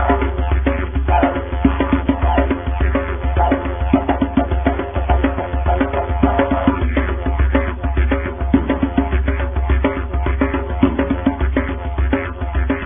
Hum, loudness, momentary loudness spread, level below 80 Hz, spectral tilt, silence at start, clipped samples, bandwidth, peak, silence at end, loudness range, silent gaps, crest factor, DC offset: none; -18 LUFS; 4 LU; -20 dBFS; -13 dB/octave; 0 s; under 0.1%; 3.7 kHz; 0 dBFS; 0 s; 1 LU; none; 16 dB; 0.5%